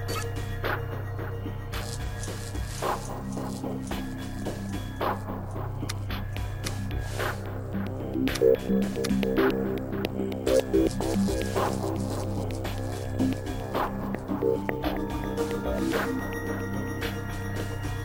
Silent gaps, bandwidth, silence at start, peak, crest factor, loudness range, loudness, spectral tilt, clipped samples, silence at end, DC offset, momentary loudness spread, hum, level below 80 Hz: none; 16.5 kHz; 0 s; -8 dBFS; 22 dB; 7 LU; -30 LUFS; -6 dB/octave; under 0.1%; 0 s; under 0.1%; 9 LU; none; -40 dBFS